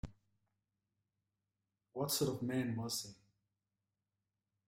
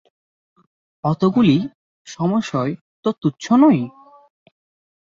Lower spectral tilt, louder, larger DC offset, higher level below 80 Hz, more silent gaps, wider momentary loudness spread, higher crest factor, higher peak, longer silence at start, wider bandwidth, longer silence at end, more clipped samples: second, -4.5 dB/octave vs -7.5 dB/octave; second, -39 LUFS vs -18 LUFS; neither; second, -66 dBFS vs -60 dBFS; second, none vs 1.75-2.05 s, 2.81-3.03 s; first, 16 LU vs 12 LU; about the same, 20 dB vs 18 dB; second, -24 dBFS vs -2 dBFS; second, 0.05 s vs 1.05 s; first, 16 kHz vs 7.6 kHz; first, 1.55 s vs 1.15 s; neither